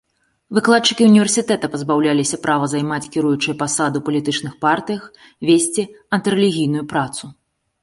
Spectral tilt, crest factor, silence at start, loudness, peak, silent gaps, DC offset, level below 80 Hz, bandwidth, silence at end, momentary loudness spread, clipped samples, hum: -4 dB/octave; 16 dB; 0.5 s; -17 LUFS; -2 dBFS; none; under 0.1%; -60 dBFS; 11.5 kHz; 0.5 s; 9 LU; under 0.1%; none